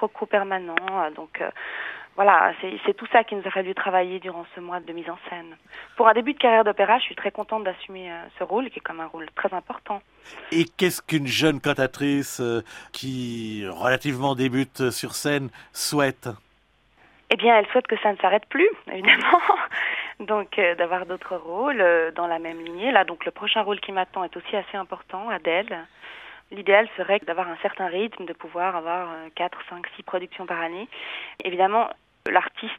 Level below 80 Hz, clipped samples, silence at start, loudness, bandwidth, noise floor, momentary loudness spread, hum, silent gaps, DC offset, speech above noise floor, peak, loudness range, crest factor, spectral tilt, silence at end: -64 dBFS; under 0.1%; 0 s; -23 LUFS; 16 kHz; -62 dBFS; 16 LU; none; none; under 0.1%; 38 dB; 0 dBFS; 7 LU; 24 dB; -4 dB/octave; 0 s